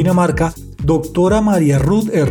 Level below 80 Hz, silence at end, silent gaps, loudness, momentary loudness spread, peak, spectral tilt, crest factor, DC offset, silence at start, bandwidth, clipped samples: -30 dBFS; 0 s; none; -15 LUFS; 6 LU; -4 dBFS; -7.5 dB/octave; 10 dB; under 0.1%; 0 s; 18.5 kHz; under 0.1%